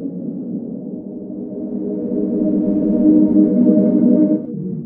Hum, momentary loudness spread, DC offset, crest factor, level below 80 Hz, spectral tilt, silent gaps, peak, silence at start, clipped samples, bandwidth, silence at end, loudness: none; 15 LU; under 0.1%; 16 dB; -52 dBFS; -14 dB/octave; none; 0 dBFS; 0 s; under 0.1%; 1.8 kHz; 0 s; -16 LUFS